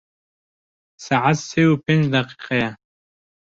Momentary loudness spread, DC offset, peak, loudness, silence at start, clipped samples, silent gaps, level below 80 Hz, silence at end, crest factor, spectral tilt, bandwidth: 6 LU; under 0.1%; -4 dBFS; -19 LUFS; 1 s; under 0.1%; none; -58 dBFS; 0.75 s; 18 dB; -6 dB/octave; 7.8 kHz